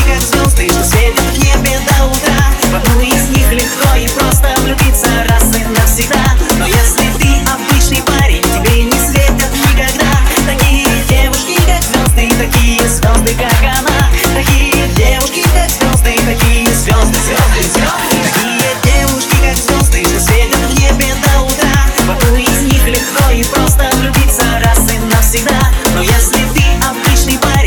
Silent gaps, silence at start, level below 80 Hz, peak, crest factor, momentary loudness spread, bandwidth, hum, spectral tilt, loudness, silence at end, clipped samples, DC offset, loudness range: none; 0 s; -12 dBFS; 0 dBFS; 10 dB; 1 LU; over 20 kHz; none; -4 dB/octave; -10 LUFS; 0 s; under 0.1%; under 0.1%; 0 LU